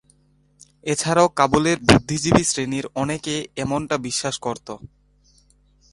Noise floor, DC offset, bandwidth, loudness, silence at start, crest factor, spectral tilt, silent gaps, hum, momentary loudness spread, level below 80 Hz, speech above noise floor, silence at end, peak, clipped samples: -59 dBFS; under 0.1%; 11.5 kHz; -20 LUFS; 0.85 s; 22 dB; -4 dB/octave; none; none; 12 LU; -44 dBFS; 39 dB; 1.15 s; 0 dBFS; under 0.1%